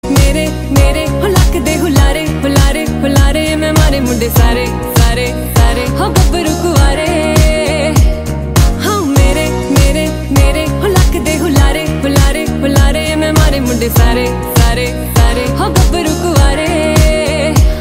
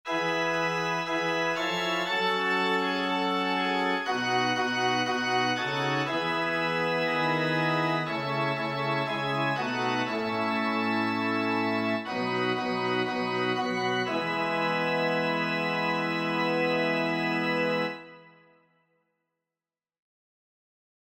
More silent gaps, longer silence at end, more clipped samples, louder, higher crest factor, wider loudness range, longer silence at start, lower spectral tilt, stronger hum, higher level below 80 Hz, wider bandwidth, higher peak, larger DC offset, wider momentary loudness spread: neither; second, 0 s vs 2.8 s; neither; first, -11 LUFS vs -27 LUFS; about the same, 10 dB vs 14 dB; about the same, 0 LU vs 2 LU; about the same, 0.05 s vs 0.05 s; about the same, -5.5 dB/octave vs -5 dB/octave; neither; first, -14 dBFS vs -72 dBFS; about the same, 16.5 kHz vs 16.5 kHz; first, 0 dBFS vs -14 dBFS; neither; about the same, 3 LU vs 3 LU